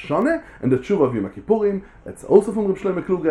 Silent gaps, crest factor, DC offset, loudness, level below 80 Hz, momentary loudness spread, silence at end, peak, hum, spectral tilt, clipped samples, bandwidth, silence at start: none; 18 dB; under 0.1%; -20 LUFS; -50 dBFS; 11 LU; 0 s; 0 dBFS; none; -8 dB/octave; under 0.1%; 11.5 kHz; 0 s